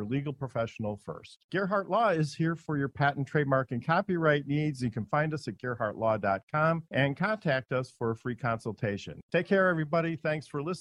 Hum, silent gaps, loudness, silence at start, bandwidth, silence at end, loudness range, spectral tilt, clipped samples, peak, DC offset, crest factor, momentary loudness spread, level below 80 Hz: none; 1.44-1.49 s, 6.43-6.47 s, 9.23-9.29 s; -30 LUFS; 0 s; 11.5 kHz; 0 s; 2 LU; -7 dB/octave; under 0.1%; -10 dBFS; under 0.1%; 20 dB; 8 LU; -64 dBFS